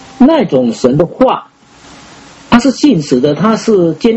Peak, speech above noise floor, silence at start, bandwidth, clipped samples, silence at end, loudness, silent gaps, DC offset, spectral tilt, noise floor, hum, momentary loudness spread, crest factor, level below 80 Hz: 0 dBFS; 28 dB; 0.2 s; 8.2 kHz; 0.5%; 0 s; -10 LUFS; none; under 0.1%; -6 dB/octave; -38 dBFS; none; 4 LU; 10 dB; -42 dBFS